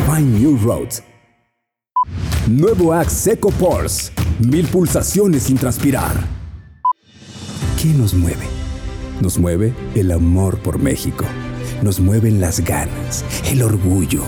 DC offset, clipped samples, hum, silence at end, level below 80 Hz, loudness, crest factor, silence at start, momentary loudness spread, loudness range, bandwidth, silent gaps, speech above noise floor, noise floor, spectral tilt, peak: under 0.1%; under 0.1%; none; 0 s; -30 dBFS; -17 LUFS; 10 dB; 0 s; 11 LU; 4 LU; over 20 kHz; none; 58 dB; -73 dBFS; -6 dB/octave; -6 dBFS